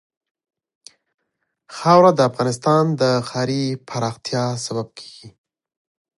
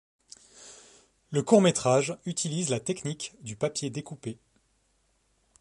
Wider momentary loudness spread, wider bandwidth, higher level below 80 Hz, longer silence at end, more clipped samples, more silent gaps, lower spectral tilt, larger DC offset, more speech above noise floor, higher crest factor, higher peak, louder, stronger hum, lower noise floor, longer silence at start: second, 18 LU vs 26 LU; about the same, 11.5 kHz vs 11.5 kHz; about the same, -64 dBFS vs -68 dBFS; second, 0.9 s vs 1.25 s; neither; neither; about the same, -5.5 dB/octave vs -5 dB/octave; neither; first, 57 dB vs 43 dB; about the same, 20 dB vs 24 dB; first, 0 dBFS vs -6 dBFS; first, -19 LUFS vs -27 LUFS; neither; first, -75 dBFS vs -70 dBFS; first, 1.7 s vs 0.6 s